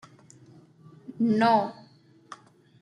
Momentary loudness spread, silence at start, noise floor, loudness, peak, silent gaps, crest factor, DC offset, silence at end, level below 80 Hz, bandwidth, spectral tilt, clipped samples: 26 LU; 1.1 s; -56 dBFS; -24 LUFS; -10 dBFS; none; 20 dB; under 0.1%; 0.45 s; -74 dBFS; 10.5 kHz; -6.5 dB/octave; under 0.1%